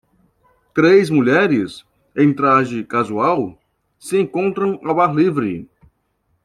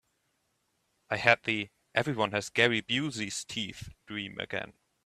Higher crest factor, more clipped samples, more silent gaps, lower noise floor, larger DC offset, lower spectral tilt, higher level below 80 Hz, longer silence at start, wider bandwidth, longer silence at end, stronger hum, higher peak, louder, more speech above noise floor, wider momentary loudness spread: second, 16 dB vs 28 dB; neither; neither; second, -66 dBFS vs -76 dBFS; neither; first, -7 dB/octave vs -3.5 dB/octave; first, -58 dBFS vs -66 dBFS; second, 0.75 s vs 1.1 s; second, 12.5 kHz vs 14 kHz; first, 0.8 s vs 0.4 s; neither; about the same, -2 dBFS vs -4 dBFS; first, -16 LUFS vs -30 LUFS; first, 50 dB vs 46 dB; about the same, 13 LU vs 14 LU